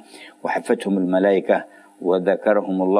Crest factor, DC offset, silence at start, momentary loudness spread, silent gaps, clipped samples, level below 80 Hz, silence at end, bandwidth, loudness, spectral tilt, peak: 16 dB; under 0.1%; 0.15 s; 8 LU; none; under 0.1%; -78 dBFS; 0 s; 11 kHz; -20 LUFS; -7 dB/octave; -4 dBFS